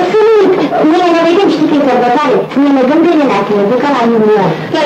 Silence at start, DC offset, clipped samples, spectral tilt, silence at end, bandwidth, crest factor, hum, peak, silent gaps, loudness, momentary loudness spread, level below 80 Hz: 0 s; under 0.1%; under 0.1%; -6.5 dB/octave; 0 s; 9 kHz; 8 dB; none; 0 dBFS; none; -9 LUFS; 3 LU; -52 dBFS